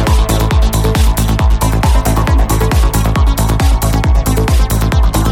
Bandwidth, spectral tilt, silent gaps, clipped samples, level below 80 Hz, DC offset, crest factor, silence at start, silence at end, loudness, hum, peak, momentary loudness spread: 17 kHz; -5.5 dB/octave; none; under 0.1%; -12 dBFS; under 0.1%; 8 dB; 0 s; 0 s; -12 LUFS; none; -2 dBFS; 1 LU